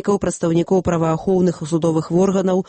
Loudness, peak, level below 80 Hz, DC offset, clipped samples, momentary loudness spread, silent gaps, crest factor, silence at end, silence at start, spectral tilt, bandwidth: -18 LUFS; -6 dBFS; -46 dBFS; under 0.1%; under 0.1%; 3 LU; none; 12 dB; 0.05 s; 0.05 s; -7 dB/octave; 8.8 kHz